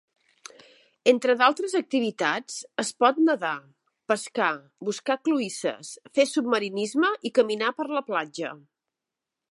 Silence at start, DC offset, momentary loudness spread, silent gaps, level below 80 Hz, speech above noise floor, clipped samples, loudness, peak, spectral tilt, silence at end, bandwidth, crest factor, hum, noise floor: 1.05 s; under 0.1%; 12 LU; none; -82 dBFS; 62 dB; under 0.1%; -25 LUFS; -6 dBFS; -3.5 dB/octave; 0.95 s; 11.5 kHz; 20 dB; none; -87 dBFS